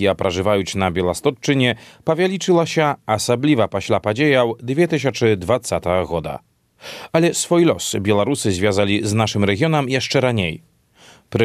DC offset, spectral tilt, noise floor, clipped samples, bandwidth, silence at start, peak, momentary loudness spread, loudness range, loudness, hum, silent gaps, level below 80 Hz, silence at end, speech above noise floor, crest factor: under 0.1%; -5 dB/octave; -49 dBFS; under 0.1%; 14.5 kHz; 0 s; -2 dBFS; 7 LU; 2 LU; -18 LUFS; none; none; -52 dBFS; 0 s; 31 dB; 16 dB